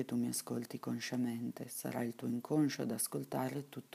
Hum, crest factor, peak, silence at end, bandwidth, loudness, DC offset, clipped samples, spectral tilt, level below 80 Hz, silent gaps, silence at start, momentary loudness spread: none; 16 dB; -22 dBFS; 0.15 s; 15.5 kHz; -39 LUFS; under 0.1%; under 0.1%; -5 dB/octave; -84 dBFS; none; 0 s; 8 LU